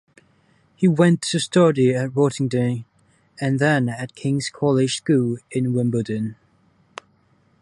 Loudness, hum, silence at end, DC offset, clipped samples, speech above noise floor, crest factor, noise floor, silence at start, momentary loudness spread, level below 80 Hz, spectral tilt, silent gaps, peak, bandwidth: -21 LUFS; none; 1.3 s; under 0.1%; under 0.1%; 41 dB; 18 dB; -60 dBFS; 0.8 s; 12 LU; -60 dBFS; -6 dB/octave; none; -4 dBFS; 11.5 kHz